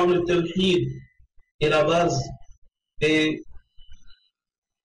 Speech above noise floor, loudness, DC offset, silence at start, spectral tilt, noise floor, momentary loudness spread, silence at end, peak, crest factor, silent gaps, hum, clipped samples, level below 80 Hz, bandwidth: 29 dB; -22 LUFS; under 0.1%; 0 s; -5.5 dB/octave; -50 dBFS; 13 LU; 0.75 s; -14 dBFS; 12 dB; 1.51-1.59 s, 2.58-2.62 s; none; under 0.1%; -48 dBFS; 10.5 kHz